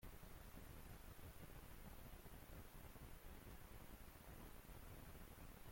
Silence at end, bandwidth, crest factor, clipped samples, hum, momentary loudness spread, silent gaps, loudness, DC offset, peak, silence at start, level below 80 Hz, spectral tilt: 0 s; 16.5 kHz; 12 dB; under 0.1%; none; 1 LU; none; -61 LUFS; under 0.1%; -46 dBFS; 0 s; -62 dBFS; -4.5 dB/octave